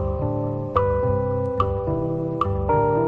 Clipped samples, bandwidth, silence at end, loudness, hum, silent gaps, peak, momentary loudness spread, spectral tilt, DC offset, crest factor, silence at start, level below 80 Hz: under 0.1%; 4.8 kHz; 0 s; -23 LUFS; none; none; -4 dBFS; 4 LU; -10.5 dB/octave; under 0.1%; 18 dB; 0 s; -34 dBFS